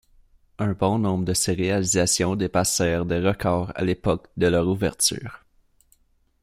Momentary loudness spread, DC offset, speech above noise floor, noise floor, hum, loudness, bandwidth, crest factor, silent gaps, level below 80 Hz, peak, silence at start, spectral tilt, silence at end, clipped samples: 5 LU; under 0.1%; 40 dB; -62 dBFS; none; -23 LUFS; 16 kHz; 18 dB; none; -48 dBFS; -6 dBFS; 0.6 s; -4.5 dB/octave; 1.05 s; under 0.1%